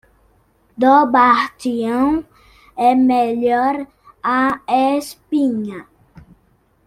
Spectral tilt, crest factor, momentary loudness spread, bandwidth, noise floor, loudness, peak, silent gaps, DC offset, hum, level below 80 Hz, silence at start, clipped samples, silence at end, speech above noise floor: -5 dB/octave; 16 dB; 13 LU; 14.5 kHz; -58 dBFS; -16 LUFS; 0 dBFS; none; under 0.1%; none; -54 dBFS; 0.8 s; under 0.1%; 1.05 s; 42 dB